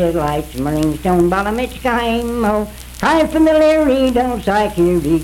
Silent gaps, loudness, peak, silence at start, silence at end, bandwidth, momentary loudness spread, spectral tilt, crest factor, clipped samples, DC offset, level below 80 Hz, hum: none; -15 LUFS; -2 dBFS; 0 s; 0 s; 17 kHz; 8 LU; -6 dB/octave; 12 dB; under 0.1%; under 0.1%; -32 dBFS; none